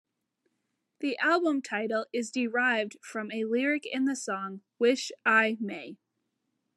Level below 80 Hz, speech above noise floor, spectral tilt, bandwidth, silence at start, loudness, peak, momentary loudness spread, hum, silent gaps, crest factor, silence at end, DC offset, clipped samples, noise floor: under -90 dBFS; 52 dB; -3.5 dB/octave; 12 kHz; 1 s; -29 LUFS; -10 dBFS; 11 LU; none; none; 20 dB; 0.8 s; under 0.1%; under 0.1%; -81 dBFS